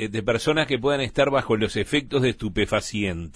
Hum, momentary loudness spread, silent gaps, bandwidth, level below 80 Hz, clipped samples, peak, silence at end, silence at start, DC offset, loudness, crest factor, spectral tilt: none; 3 LU; none; 11 kHz; -44 dBFS; under 0.1%; -8 dBFS; 0.05 s; 0 s; under 0.1%; -23 LUFS; 16 dB; -5 dB/octave